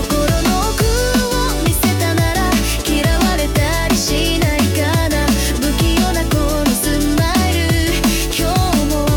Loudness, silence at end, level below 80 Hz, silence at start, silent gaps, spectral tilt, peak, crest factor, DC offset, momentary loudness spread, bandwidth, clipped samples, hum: -15 LUFS; 0 s; -22 dBFS; 0 s; none; -4.5 dB/octave; -6 dBFS; 10 dB; under 0.1%; 1 LU; 19 kHz; under 0.1%; none